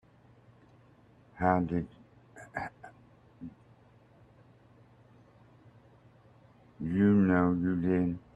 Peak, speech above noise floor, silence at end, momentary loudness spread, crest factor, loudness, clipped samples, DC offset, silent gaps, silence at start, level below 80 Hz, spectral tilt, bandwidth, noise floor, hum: -10 dBFS; 31 dB; 0.2 s; 25 LU; 22 dB; -29 LUFS; under 0.1%; under 0.1%; none; 1.35 s; -62 dBFS; -10 dB/octave; 8 kHz; -60 dBFS; 50 Hz at -65 dBFS